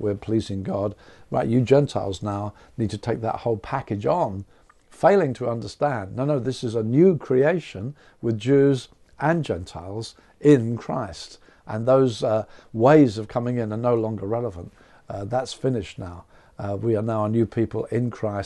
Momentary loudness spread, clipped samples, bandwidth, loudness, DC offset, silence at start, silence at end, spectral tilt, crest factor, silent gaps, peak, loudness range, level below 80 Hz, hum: 16 LU; under 0.1%; 11 kHz; -23 LUFS; under 0.1%; 0 s; 0 s; -7.5 dB/octave; 20 dB; none; -4 dBFS; 6 LU; -54 dBFS; none